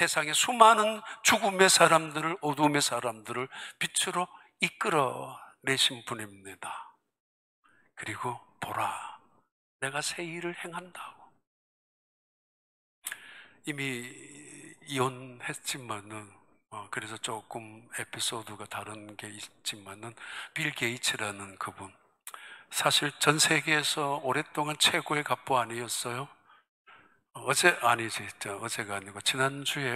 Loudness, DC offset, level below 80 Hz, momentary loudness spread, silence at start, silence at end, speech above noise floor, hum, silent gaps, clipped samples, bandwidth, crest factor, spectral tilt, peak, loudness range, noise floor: -28 LUFS; under 0.1%; -78 dBFS; 21 LU; 0 s; 0 s; 29 dB; none; 7.20-7.63 s, 9.51-9.79 s, 11.47-13.02 s, 26.69-26.85 s; under 0.1%; 16 kHz; 28 dB; -2 dB/octave; -4 dBFS; 13 LU; -59 dBFS